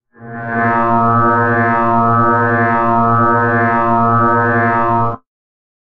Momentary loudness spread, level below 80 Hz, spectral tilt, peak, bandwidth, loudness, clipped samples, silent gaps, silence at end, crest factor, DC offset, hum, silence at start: 5 LU; -44 dBFS; -10 dB/octave; 0 dBFS; 5.2 kHz; -13 LUFS; under 0.1%; none; 0.8 s; 12 dB; under 0.1%; none; 0.2 s